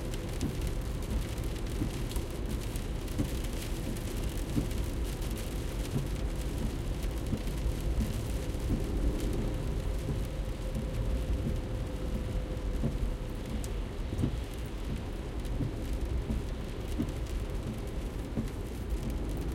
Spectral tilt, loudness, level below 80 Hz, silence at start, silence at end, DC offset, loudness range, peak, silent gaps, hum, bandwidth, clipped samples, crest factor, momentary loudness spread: -6 dB/octave; -36 LUFS; -36 dBFS; 0 s; 0 s; under 0.1%; 2 LU; -16 dBFS; none; none; 16.5 kHz; under 0.1%; 18 dB; 4 LU